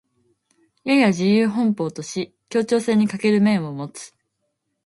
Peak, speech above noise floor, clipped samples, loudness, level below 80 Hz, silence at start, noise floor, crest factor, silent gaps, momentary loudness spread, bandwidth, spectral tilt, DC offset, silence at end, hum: -4 dBFS; 55 dB; under 0.1%; -20 LUFS; -66 dBFS; 0.85 s; -74 dBFS; 16 dB; none; 14 LU; 11.5 kHz; -6 dB/octave; under 0.1%; 0.8 s; none